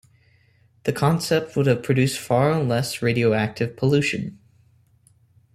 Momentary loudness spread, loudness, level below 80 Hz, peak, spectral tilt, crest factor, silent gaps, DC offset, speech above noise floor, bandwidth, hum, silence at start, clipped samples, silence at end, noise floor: 7 LU; -22 LUFS; -56 dBFS; -4 dBFS; -6 dB/octave; 18 dB; none; under 0.1%; 38 dB; 15 kHz; none; 0.85 s; under 0.1%; 1.2 s; -59 dBFS